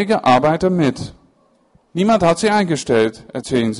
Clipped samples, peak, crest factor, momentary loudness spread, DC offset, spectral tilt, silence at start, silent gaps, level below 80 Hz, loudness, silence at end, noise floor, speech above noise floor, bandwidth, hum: under 0.1%; -4 dBFS; 14 dB; 15 LU; under 0.1%; -5.5 dB/octave; 0 s; none; -48 dBFS; -16 LUFS; 0 s; -57 dBFS; 41 dB; 11.5 kHz; none